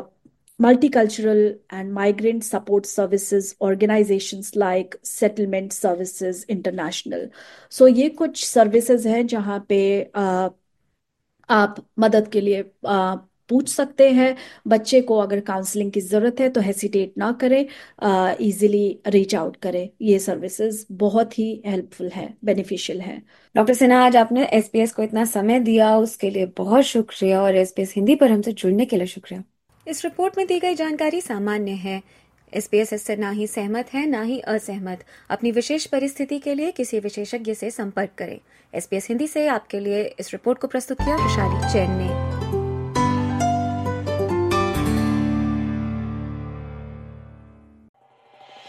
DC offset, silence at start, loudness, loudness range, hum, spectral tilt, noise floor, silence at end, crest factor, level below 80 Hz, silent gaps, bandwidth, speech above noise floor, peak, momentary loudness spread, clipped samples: under 0.1%; 0 s; -21 LUFS; 7 LU; none; -5.5 dB/octave; -75 dBFS; 0 s; 18 dB; -46 dBFS; 47.89-47.94 s; 15 kHz; 55 dB; -2 dBFS; 13 LU; under 0.1%